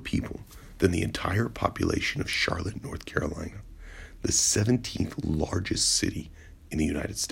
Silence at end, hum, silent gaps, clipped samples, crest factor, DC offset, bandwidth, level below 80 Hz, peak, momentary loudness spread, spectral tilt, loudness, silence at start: 0 s; none; none; under 0.1%; 20 dB; under 0.1%; 16 kHz; -44 dBFS; -8 dBFS; 18 LU; -3.5 dB/octave; -27 LUFS; 0 s